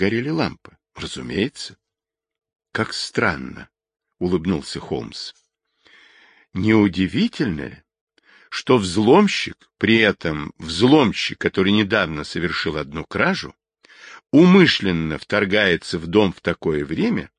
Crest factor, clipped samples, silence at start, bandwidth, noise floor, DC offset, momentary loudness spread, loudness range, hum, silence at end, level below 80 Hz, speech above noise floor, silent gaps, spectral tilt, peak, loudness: 20 dB; under 0.1%; 0 s; 10.5 kHz; -86 dBFS; under 0.1%; 16 LU; 9 LU; none; 0.1 s; -46 dBFS; 67 dB; 8.01-8.07 s; -5.5 dB/octave; -2 dBFS; -19 LUFS